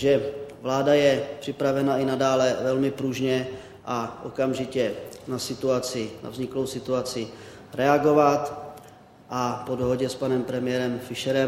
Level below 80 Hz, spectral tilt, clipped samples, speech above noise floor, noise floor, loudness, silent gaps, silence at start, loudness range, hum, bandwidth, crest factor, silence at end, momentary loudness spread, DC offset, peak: -58 dBFS; -5.5 dB/octave; under 0.1%; 25 dB; -49 dBFS; -25 LUFS; none; 0 s; 5 LU; none; 16 kHz; 20 dB; 0 s; 14 LU; under 0.1%; -6 dBFS